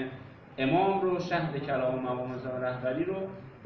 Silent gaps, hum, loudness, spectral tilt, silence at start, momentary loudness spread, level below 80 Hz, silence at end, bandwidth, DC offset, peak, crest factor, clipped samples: none; none; -31 LUFS; -5.5 dB/octave; 0 s; 13 LU; -62 dBFS; 0 s; 6.4 kHz; under 0.1%; -14 dBFS; 16 dB; under 0.1%